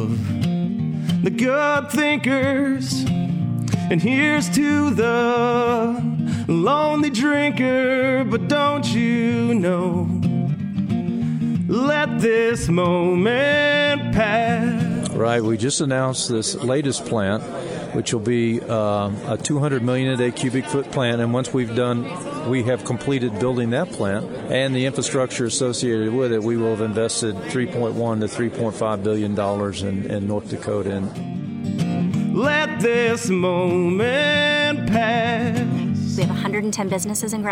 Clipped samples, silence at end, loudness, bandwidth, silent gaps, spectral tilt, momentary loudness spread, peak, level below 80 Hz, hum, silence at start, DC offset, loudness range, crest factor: under 0.1%; 0 s; -20 LUFS; 16 kHz; none; -5.5 dB/octave; 6 LU; -6 dBFS; -50 dBFS; none; 0 s; under 0.1%; 4 LU; 14 dB